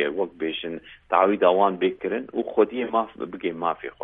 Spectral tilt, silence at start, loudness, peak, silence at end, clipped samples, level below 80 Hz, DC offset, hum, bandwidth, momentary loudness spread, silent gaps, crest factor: -9 dB/octave; 0 s; -24 LUFS; -4 dBFS; 0 s; under 0.1%; -62 dBFS; under 0.1%; none; 4 kHz; 12 LU; none; 20 dB